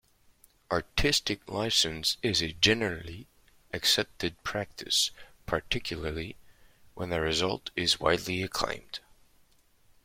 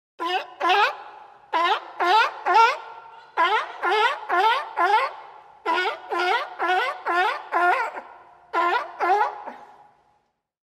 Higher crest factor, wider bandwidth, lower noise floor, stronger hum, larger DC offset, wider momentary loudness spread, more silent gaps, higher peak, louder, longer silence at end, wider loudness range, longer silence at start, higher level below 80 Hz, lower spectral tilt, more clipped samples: first, 24 dB vs 18 dB; about the same, 16.5 kHz vs 15.5 kHz; second, -63 dBFS vs -69 dBFS; neither; neither; about the same, 15 LU vs 13 LU; neither; about the same, -8 dBFS vs -6 dBFS; second, -28 LUFS vs -22 LUFS; about the same, 1.05 s vs 1.15 s; about the same, 4 LU vs 3 LU; first, 0.7 s vs 0.2 s; first, -48 dBFS vs -78 dBFS; first, -2.5 dB/octave vs -1 dB/octave; neither